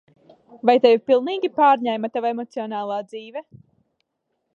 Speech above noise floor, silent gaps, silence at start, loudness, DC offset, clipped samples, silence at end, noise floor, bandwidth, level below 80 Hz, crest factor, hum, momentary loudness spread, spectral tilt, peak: 56 dB; none; 0.55 s; -20 LUFS; under 0.1%; under 0.1%; 1.15 s; -76 dBFS; 7.2 kHz; -76 dBFS; 20 dB; none; 18 LU; -6 dB/octave; -2 dBFS